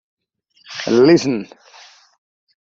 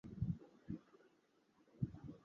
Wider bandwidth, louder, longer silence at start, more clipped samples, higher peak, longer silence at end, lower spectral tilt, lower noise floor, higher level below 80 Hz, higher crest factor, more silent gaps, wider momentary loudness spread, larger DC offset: about the same, 7.6 kHz vs 7 kHz; first, -15 LUFS vs -48 LUFS; first, 0.7 s vs 0.05 s; neither; first, -2 dBFS vs -28 dBFS; first, 1.2 s vs 0.05 s; second, -5.5 dB/octave vs -11 dB/octave; second, -59 dBFS vs -76 dBFS; about the same, -60 dBFS vs -62 dBFS; about the same, 18 dB vs 22 dB; neither; first, 20 LU vs 8 LU; neither